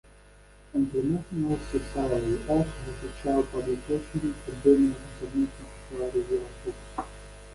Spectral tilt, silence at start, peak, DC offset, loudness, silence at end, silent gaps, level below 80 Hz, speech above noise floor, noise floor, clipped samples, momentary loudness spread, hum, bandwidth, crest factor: -7.5 dB/octave; 0.75 s; -8 dBFS; under 0.1%; -29 LUFS; 0 s; none; -44 dBFS; 26 dB; -53 dBFS; under 0.1%; 14 LU; 50 Hz at -45 dBFS; 11.5 kHz; 20 dB